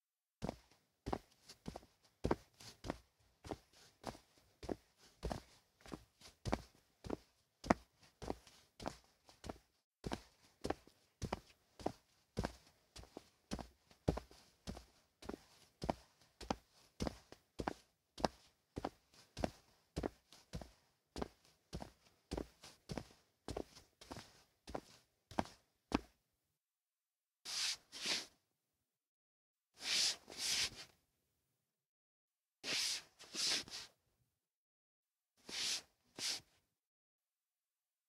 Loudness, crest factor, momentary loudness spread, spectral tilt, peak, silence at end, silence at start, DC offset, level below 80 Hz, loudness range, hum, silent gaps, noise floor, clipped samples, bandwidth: -45 LUFS; 38 dB; 21 LU; -3 dB/octave; -10 dBFS; 1.65 s; 0.4 s; under 0.1%; -62 dBFS; 10 LU; none; 9.84-9.92 s, 29.07-29.55 s, 31.86-32.28 s, 34.54-35.04 s; under -90 dBFS; under 0.1%; 16 kHz